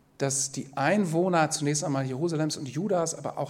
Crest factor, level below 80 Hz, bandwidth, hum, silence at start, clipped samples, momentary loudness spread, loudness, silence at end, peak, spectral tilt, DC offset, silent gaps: 16 dB; -70 dBFS; 16 kHz; none; 0.2 s; under 0.1%; 6 LU; -27 LUFS; 0 s; -10 dBFS; -4.5 dB/octave; under 0.1%; none